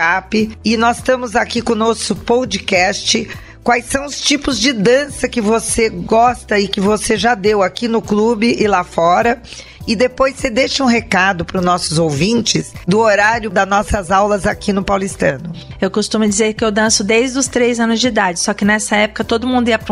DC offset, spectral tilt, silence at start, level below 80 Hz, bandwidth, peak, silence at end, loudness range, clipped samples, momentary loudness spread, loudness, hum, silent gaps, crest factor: under 0.1%; -3.5 dB/octave; 0 s; -38 dBFS; 13.5 kHz; 0 dBFS; 0 s; 1 LU; under 0.1%; 5 LU; -14 LUFS; none; none; 14 dB